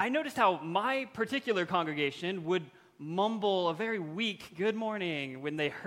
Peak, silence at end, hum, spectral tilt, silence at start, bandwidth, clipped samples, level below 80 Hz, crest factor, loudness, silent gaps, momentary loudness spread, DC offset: -14 dBFS; 0 s; none; -5.5 dB/octave; 0 s; 16 kHz; under 0.1%; -74 dBFS; 18 dB; -32 LUFS; none; 7 LU; under 0.1%